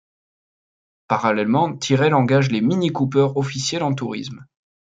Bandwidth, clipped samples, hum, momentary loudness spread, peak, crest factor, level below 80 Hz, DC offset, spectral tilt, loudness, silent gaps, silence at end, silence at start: 9.2 kHz; under 0.1%; none; 8 LU; -2 dBFS; 18 dB; -62 dBFS; under 0.1%; -6 dB/octave; -19 LUFS; none; 0.4 s; 1.1 s